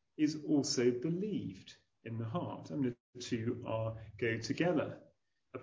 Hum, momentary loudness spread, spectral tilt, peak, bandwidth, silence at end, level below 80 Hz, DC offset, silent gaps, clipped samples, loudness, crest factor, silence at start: none; 14 LU; -5.5 dB/octave; -18 dBFS; 8 kHz; 0 s; -68 dBFS; under 0.1%; 3.00-3.13 s; under 0.1%; -37 LUFS; 18 dB; 0.2 s